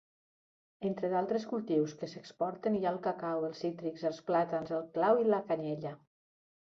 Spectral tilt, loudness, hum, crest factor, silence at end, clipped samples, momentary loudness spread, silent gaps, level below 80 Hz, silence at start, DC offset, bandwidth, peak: -7 dB/octave; -34 LUFS; none; 20 dB; 0.7 s; under 0.1%; 9 LU; none; -78 dBFS; 0.8 s; under 0.1%; 7.6 kHz; -16 dBFS